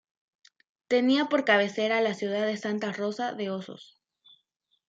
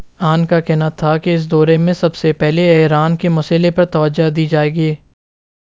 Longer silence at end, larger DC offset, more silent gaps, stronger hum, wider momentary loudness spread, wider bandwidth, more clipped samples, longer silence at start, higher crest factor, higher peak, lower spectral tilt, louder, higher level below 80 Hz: first, 1.05 s vs 0.8 s; second, under 0.1% vs 0.3%; neither; neither; first, 11 LU vs 5 LU; about the same, 7.8 kHz vs 7.6 kHz; neither; first, 0.9 s vs 0 s; first, 20 dB vs 14 dB; second, -10 dBFS vs 0 dBFS; second, -5 dB/octave vs -8 dB/octave; second, -27 LUFS vs -13 LUFS; second, -82 dBFS vs -48 dBFS